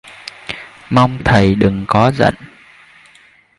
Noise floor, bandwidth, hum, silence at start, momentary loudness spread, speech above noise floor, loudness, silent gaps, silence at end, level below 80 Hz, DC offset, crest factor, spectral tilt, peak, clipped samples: -48 dBFS; 11.5 kHz; none; 0.05 s; 18 LU; 36 dB; -13 LUFS; none; 1.15 s; -36 dBFS; under 0.1%; 16 dB; -7 dB/octave; 0 dBFS; under 0.1%